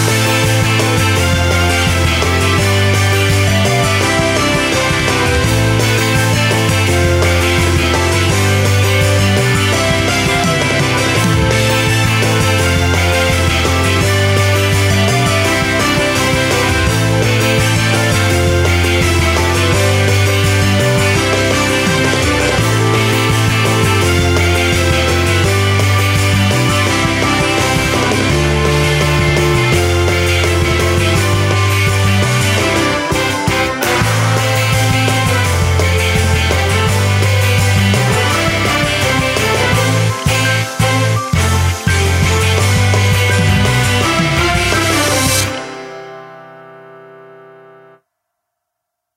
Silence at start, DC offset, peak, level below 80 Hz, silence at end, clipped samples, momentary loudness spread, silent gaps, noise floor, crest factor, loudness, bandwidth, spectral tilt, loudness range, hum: 0 s; under 0.1%; 0 dBFS; -30 dBFS; 2 s; under 0.1%; 1 LU; none; -76 dBFS; 12 dB; -12 LUFS; 16 kHz; -4.5 dB/octave; 1 LU; none